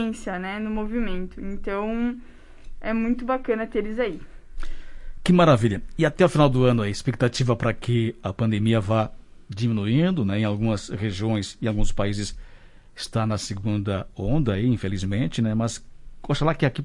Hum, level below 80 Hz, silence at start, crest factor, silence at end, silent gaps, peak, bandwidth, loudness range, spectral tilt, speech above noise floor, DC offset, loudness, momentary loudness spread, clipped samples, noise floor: none; -36 dBFS; 0 s; 20 dB; 0 s; none; -4 dBFS; 11.5 kHz; 7 LU; -6.5 dB/octave; 23 dB; under 0.1%; -24 LUFS; 12 LU; under 0.1%; -46 dBFS